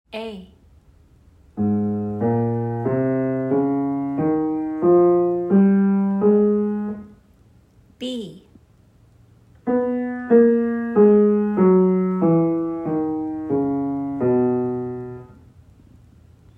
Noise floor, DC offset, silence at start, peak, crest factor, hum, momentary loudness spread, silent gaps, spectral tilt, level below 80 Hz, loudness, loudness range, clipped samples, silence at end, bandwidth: -53 dBFS; under 0.1%; 0.15 s; -4 dBFS; 16 dB; none; 15 LU; none; -10 dB/octave; -56 dBFS; -20 LUFS; 7 LU; under 0.1%; 1.25 s; 4.7 kHz